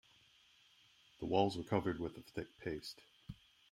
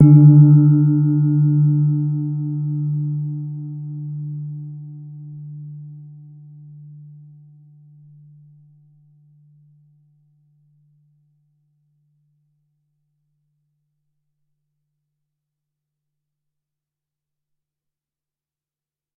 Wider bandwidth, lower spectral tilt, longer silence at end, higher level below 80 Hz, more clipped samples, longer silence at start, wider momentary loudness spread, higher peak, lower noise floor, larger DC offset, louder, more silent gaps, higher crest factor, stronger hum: first, 16 kHz vs 1.5 kHz; second, -6.5 dB/octave vs -17 dB/octave; second, 0.4 s vs 13.05 s; about the same, -66 dBFS vs -70 dBFS; neither; first, 1.2 s vs 0 s; second, 21 LU vs 26 LU; second, -18 dBFS vs -2 dBFS; second, -69 dBFS vs under -90 dBFS; neither; second, -40 LUFS vs -16 LUFS; neither; about the same, 24 dB vs 20 dB; neither